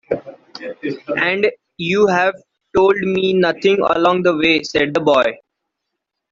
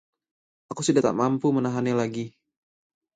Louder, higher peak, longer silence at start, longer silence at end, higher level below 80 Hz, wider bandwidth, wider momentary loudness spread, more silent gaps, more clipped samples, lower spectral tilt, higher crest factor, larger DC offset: first, -16 LUFS vs -24 LUFS; first, -2 dBFS vs -8 dBFS; second, 0.1 s vs 0.7 s; about the same, 0.95 s vs 0.85 s; first, -52 dBFS vs -68 dBFS; second, 7.6 kHz vs 9.4 kHz; about the same, 12 LU vs 14 LU; neither; neither; about the same, -5.5 dB/octave vs -6 dB/octave; about the same, 16 dB vs 20 dB; neither